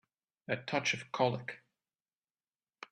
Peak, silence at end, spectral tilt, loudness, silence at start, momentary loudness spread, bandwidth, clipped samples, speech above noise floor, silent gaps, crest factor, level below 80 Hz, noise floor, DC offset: -16 dBFS; 0.05 s; -4 dB/octave; -35 LUFS; 0.5 s; 20 LU; 12 kHz; under 0.1%; over 55 dB; none; 24 dB; -78 dBFS; under -90 dBFS; under 0.1%